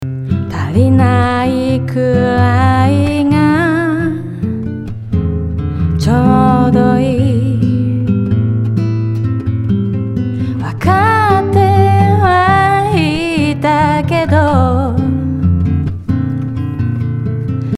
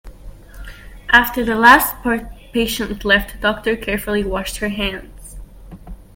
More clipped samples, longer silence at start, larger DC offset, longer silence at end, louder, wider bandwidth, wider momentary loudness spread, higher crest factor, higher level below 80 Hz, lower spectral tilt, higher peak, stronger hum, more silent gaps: neither; about the same, 0 s vs 0.05 s; neither; second, 0 s vs 0.15 s; first, -13 LUFS vs -16 LUFS; second, 12 kHz vs 17 kHz; second, 8 LU vs 18 LU; second, 12 dB vs 18 dB; about the same, -34 dBFS vs -34 dBFS; first, -8 dB/octave vs -3.5 dB/octave; about the same, 0 dBFS vs 0 dBFS; neither; neither